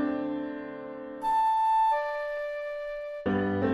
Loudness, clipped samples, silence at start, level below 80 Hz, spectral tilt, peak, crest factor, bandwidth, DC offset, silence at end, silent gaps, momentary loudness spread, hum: -29 LUFS; under 0.1%; 0 s; -60 dBFS; -7.5 dB/octave; -16 dBFS; 14 dB; 13 kHz; under 0.1%; 0 s; none; 14 LU; none